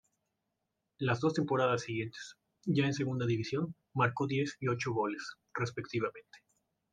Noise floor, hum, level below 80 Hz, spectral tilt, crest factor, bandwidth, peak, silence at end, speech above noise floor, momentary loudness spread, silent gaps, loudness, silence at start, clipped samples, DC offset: -85 dBFS; none; -74 dBFS; -6 dB/octave; 20 dB; 9.4 kHz; -14 dBFS; 0.55 s; 52 dB; 11 LU; none; -34 LUFS; 1 s; under 0.1%; under 0.1%